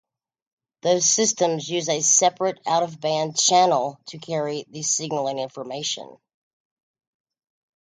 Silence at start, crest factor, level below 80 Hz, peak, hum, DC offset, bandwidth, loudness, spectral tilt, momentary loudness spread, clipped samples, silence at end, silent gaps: 0.85 s; 20 dB; -74 dBFS; -4 dBFS; none; under 0.1%; 10.5 kHz; -21 LUFS; -2 dB/octave; 13 LU; under 0.1%; 1.75 s; none